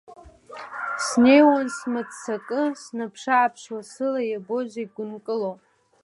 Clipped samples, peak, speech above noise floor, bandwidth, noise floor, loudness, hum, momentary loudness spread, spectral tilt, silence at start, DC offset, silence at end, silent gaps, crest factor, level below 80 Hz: under 0.1%; -4 dBFS; 19 dB; 11.5 kHz; -42 dBFS; -23 LUFS; none; 18 LU; -4 dB/octave; 0.1 s; under 0.1%; 0.5 s; none; 20 dB; -64 dBFS